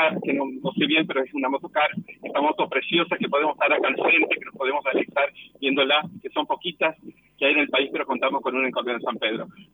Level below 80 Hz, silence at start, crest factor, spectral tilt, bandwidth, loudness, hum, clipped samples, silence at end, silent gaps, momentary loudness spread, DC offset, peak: -74 dBFS; 0 s; 16 dB; -7 dB/octave; 19.5 kHz; -23 LUFS; none; under 0.1%; 0.1 s; none; 8 LU; under 0.1%; -8 dBFS